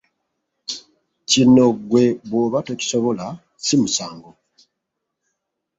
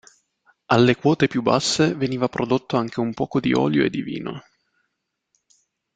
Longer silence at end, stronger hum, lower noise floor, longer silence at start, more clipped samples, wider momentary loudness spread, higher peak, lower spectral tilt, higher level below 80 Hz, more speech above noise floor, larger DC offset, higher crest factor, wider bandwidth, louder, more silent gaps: about the same, 1.55 s vs 1.55 s; neither; about the same, -79 dBFS vs -77 dBFS; about the same, 0.7 s vs 0.7 s; neither; first, 20 LU vs 11 LU; about the same, -2 dBFS vs -2 dBFS; about the same, -4.5 dB/octave vs -5.5 dB/octave; about the same, -58 dBFS vs -56 dBFS; first, 61 dB vs 57 dB; neither; about the same, 18 dB vs 20 dB; second, 8 kHz vs 9.4 kHz; first, -18 LUFS vs -21 LUFS; neither